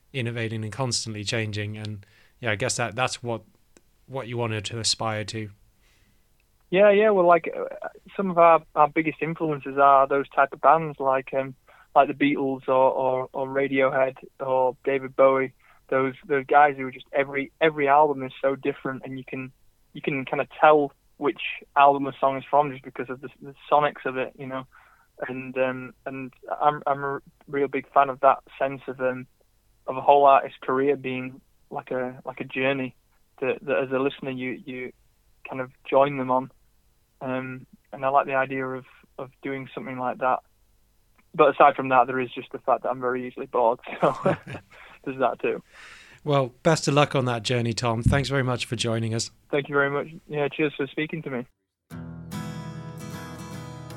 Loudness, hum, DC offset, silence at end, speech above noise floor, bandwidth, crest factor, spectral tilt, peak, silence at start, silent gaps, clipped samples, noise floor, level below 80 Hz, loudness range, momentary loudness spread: -24 LUFS; none; under 0.1%; 0 s; 39 dB; 13 kHz; 22 dB; -5 dB/octave; -2 dBFS; 0.15 s; none; under 0.1%; -63 dBFS; -54 dBFS; 7 LU; 17 LU